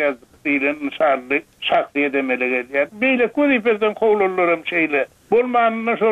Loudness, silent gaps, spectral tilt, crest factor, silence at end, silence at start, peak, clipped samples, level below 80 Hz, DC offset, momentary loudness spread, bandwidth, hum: -19 LUFS; none; -6 dB/octave; 14 dB; 0 s; 0 s; -4 dBFS; under 0.1%; -62 dBFS; under 0.1%; 5 LU; 9.6 kHz; none